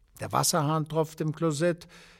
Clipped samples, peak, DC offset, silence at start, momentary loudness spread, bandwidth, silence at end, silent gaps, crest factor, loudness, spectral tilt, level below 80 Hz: under 0.1%; -10 dBFS; under 0.1%; 0.2 s; 6 LU; 16.5 kHz; 0.2 s; none; 20 dB; -28 LUFS; -4.5 dB/octave; -62 dBFS